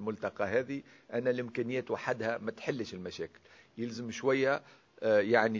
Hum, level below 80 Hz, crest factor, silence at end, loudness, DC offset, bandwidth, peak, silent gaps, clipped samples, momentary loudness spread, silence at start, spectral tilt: none; -70 dBFS; 22 dB; 0 s; -33 LUFS; under 0.1%; 7.6 kHz; -12 dBFS; none; under 0.1%; 13 LU; 0 s; -5.5 dB/octave